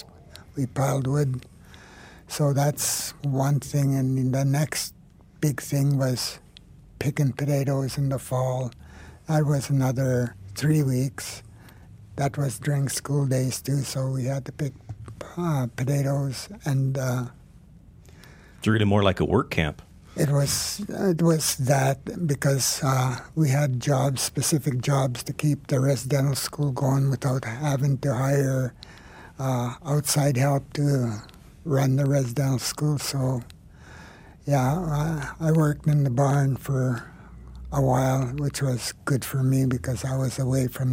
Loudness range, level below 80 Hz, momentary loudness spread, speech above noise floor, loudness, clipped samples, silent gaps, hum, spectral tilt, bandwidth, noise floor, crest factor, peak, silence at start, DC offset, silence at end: 4 LU; -50 dBFS; 10 LU; 26 dB; -25 LUFS; under 0.1%; none; none; -5.5 dB/octave; 16 kHz; -50 dBFS; 20 dB; -4 dBFS; 0 s; under 0.1%; 0 s